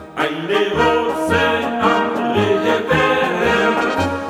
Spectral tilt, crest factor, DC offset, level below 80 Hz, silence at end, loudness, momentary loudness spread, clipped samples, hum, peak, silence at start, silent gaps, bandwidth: -5 dB/octave; 14 dB; under 0.1%; -44 dBFS; 0 s; -16 LUFS; 3 LU; under 0.1%; none; -2 dBFS; 0 s; none; 16 kHz